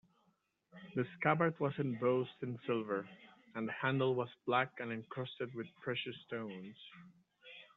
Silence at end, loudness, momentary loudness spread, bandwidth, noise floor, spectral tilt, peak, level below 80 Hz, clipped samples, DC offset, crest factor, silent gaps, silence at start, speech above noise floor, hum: 0.1 s; -38 LUFS; 18 LU; 4.2 kHz; -78 dBFS; -4.5 dB/octave; -18 dBFS; -82 dBFS; under 0.1%; under 0.1%; 22 dB; none; 0.75 s; 40 dB; none